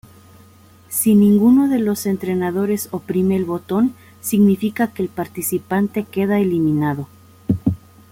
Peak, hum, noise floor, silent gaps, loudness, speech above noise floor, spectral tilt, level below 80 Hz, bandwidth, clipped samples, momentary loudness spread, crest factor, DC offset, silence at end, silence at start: -4 dBFS; none; -47 dBFS; none; -18 LUFS; 30 dB; -6.5 dB/octave; -52 dBFS; 16.5 kHz; under 0.1%; 11 LU; 14 dB; under 0.1%; 0.35 s; 0.9 s